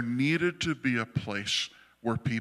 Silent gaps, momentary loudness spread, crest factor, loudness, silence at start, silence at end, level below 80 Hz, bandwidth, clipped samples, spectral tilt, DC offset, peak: none; 7 LU; 16 dB; -30 LUFS; 0 s; 0 s; -60 dBFS; 13.5 kHz; under 0.1%; -4.5 dB/octave; under 0.1%; -14 dBFS